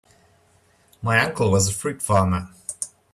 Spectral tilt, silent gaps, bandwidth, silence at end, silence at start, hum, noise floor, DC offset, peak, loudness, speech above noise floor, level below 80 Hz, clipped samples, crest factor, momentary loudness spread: -4.5 dB/octave; none; 14.5 kHz; 0.25 s; 1 s; none; -59 dBFS; under 0.1%; -4 dBFS; -22 LUFS; 38 dB; -52 dBFS; under 0.1%; 20 dB; 11 LU